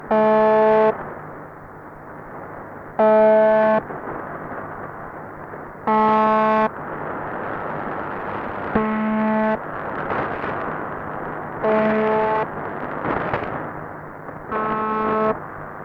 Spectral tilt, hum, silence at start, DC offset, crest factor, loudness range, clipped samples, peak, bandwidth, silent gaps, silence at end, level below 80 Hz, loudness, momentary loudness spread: -8.5 dB/octave; none; 0 s; under 0.1%; 14 dB; 4 LU; under 0.1%; -8 dBFS; 5.6 kHz; none; 0 s; -50 dBFS; -21 LUFS; 19 LU